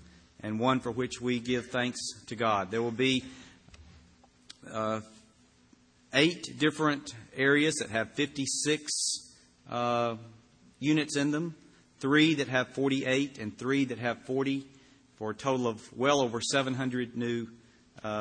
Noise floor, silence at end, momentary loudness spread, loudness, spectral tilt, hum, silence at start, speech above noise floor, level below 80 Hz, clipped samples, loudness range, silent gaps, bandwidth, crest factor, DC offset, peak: -62 dBFS; 0 s; 11 LU; -30 LUFS; -4 dB/octave; none; 0 s; 33 dB; -66 dBFS; under 0.1%; 4 LU; none; 10.5 kHz; 22 dB; under 0.1%; -10 dBFS